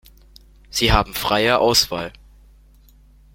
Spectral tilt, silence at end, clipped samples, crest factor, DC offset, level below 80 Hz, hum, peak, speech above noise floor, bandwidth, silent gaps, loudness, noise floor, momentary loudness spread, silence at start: -3 dB/octave; 1.25 s; under 0.1%; 20 dB; under 0.1%; -34 dBFS; none; -2 dBFS; 32 dB; 16.5 kHz; none; -18 LUFS; -50 dBFS; 13 LU; 0.75 s